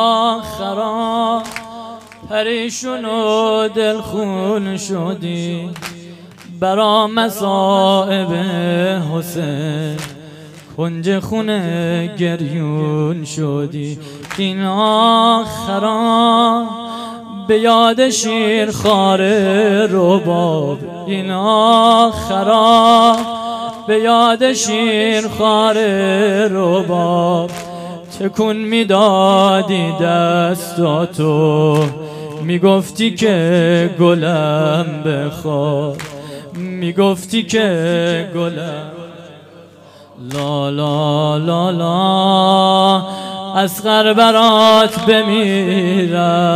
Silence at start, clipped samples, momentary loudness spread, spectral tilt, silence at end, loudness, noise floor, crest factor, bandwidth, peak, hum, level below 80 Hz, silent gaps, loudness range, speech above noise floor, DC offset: 0 s; under 0.1%; 14 LU; -5 dB/octave; 0 s; -14 LUFS; -41 dBFS; 14 dB; 15.5 kHz; 0 dBFS; none; -52 dBFS; none; 8 LU; 27 dB; under 0.1%